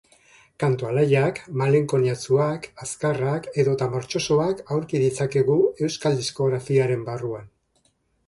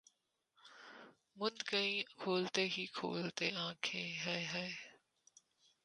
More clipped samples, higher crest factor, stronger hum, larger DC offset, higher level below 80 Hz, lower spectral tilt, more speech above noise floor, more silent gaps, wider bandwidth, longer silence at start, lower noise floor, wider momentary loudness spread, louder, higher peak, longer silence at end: neither; second, 16 dB vs 26 dB; neither; neither; first, -58 dBFS vs -86 dBFS; first, -6 dB/octave vs -3.5 dB/octave; about the same, 44 dB vs 42 dB; neither; about the same, 11.5 kHz vs 11 kHz; about the same, 0.6 s vs 0.65 s; second, -67 dBFS vs -82 dBFS; second, 7 LU vs 21 LU; first, -23 LUFS vs -39 LUFS; first, -6 dBFS vs -18 dBFS; about the same, 0.8 s vs 0.9 s